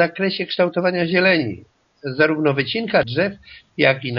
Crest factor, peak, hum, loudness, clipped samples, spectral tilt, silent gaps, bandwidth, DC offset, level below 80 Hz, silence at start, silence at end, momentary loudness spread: 20 dB; 0 dBFS; none; -19 LUFS; under 0.1%; -3.5 dB/octave; none; 5.8 kHz; under 0.1%; -56 dBFS; 0 s; 0 s; 13 LU